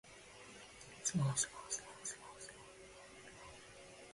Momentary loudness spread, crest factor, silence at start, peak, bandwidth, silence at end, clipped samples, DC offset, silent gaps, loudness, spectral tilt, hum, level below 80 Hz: 20 LU; 22 dB; 0.05 s; -24 dBFS; 11.5 kHz; 0 s; under 0.1%; under 0.1%; none; -41 LUFS; -3.5 dB/octave; none; -72 dBFS